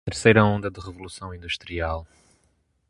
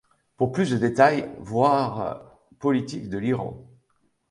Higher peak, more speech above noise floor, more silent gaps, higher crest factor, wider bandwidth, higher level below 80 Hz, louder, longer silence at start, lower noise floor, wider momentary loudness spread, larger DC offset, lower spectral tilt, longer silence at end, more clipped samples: about the same, -2 dBFS vs -4 dBFS; about the same, 44 dB vs 46 dB; neither; about the same, 24 dB vs 20 dB; about the same, 11.5 kHz vs 11.5 kHz; first, -42 dBFS vs -58 dBFS; about the same, -23 LUFS vs -24 LUFS; second, 0.05 s vs 0.4 s; about the same, -67 dBFS vs -69 dBFS; first, 20 LU vs 12 LU; neither; second, -5.5 dB/octave vs -7 dB/octave; first, 0.85 s vs 0.7 s; neither